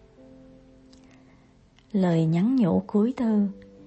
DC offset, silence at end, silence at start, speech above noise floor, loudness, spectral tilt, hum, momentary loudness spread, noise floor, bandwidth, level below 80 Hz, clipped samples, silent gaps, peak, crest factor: under 0.1%; 0.25 s; 1.95 s; 34 dB; -24 LUFS; -9.5 dB/octave; none; 5 LU; -57 dBFS; 8.2 kHz; -60 dBFS; under 0.1%; none; -12 dBFS; 14 dB